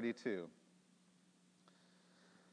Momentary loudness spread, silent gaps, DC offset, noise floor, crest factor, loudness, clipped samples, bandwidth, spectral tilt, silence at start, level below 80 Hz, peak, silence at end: 26 LU; none; under 0.1%; -72 dBFS; 20 dB; -45 LUFS; under 0.1%; 10 kHz; -6 dB/octave; 0 s; under -90 dBFS; -28 dBFS; 2 s